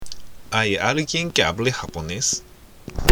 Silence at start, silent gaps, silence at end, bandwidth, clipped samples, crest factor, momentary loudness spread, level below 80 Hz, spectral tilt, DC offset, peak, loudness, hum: 0 s; none; 0 s; over 20 kHz; under 0.1%; 22 dB; 18 LU; -40 dBFS; -3 dB/octave; under 0.1%; 0 dBFS; -22 LUFS; none